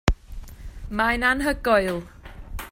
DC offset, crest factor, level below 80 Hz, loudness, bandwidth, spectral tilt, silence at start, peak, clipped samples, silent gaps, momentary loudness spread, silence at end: under 0.1%; 24 dB; -34 dBFS; -23 LUFS; 16 kHz; -5 dB/octave; 0.05 s; 0 dBFS; under 0.1%; none; 22 LU; 0 s